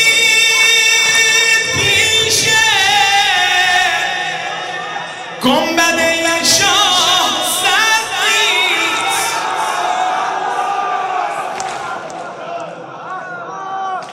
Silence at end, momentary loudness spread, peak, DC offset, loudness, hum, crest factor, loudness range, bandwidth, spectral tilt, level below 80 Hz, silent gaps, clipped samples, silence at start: 0 s; 17 LU; -2 dBFS; under 0.1%; -12 LUFS; none; 12 dB; 10 LU; 16.5 kHz; -0.5 dB/octave; -52 dBFS; none; under 0.1%; 0 s